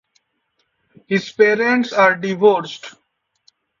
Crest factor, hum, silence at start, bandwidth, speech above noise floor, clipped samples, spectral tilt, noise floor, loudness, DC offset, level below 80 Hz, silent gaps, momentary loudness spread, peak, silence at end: 18 dB; none; 1.1 s; 7.4 kHz; 53 dB; under 0.1%; -5.5 dB/octave; -69 dBFS; -16 LUFS; under 0.1%; -66 dBFS; none; 17 LU; -2 dBFS; 0.9 s